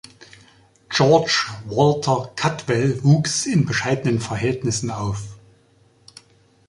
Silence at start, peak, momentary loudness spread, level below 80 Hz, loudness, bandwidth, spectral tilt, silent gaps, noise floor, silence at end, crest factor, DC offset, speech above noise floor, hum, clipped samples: 0.2 s; -2 dBFS; 9 LU; -50 dBFS; -20 LUFS; 11.5 kHz; -5 dB/octave; none; -56 dBFS; 1.3 s; 20 dB; under 0.1%; 37 dB; none; under 0.1%